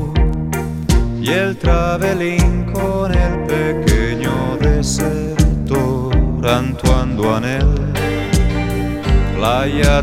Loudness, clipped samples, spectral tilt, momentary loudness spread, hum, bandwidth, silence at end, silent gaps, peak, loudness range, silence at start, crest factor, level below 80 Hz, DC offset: -17 LUFS; under 0.1%; -6 dB/octave; 3 LU; none; 15.5 kHz; 0 s; none; 0 dBFS; 0 LU; 0 s; 14 dB; -20 dBFS; under 0.1%